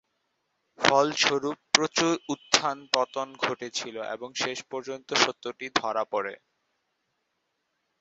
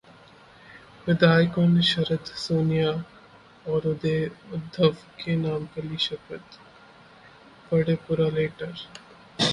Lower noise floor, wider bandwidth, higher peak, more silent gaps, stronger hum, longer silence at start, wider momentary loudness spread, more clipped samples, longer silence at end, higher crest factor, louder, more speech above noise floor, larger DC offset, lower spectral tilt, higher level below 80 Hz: first, -78 dBFS vs -51 dBFS; second, 8.2 kHz vs 11 kHz; about the same, -2 dBFS vs -4 dBFS; neither; neither; about the same, 0.8 s vs 0.7 s; second, 13 LU vs 19 LU; neither; first, 1.65 s vs 0 s; first, 28 dB vs 22 dB; about the same, -26 LUFS vs -25 LUFS; first, 50 dB vs 27 dB; neither; second, -2 dB/octave vs -6.5 dB/octave; second, -70 dBFS vs -58 dBFS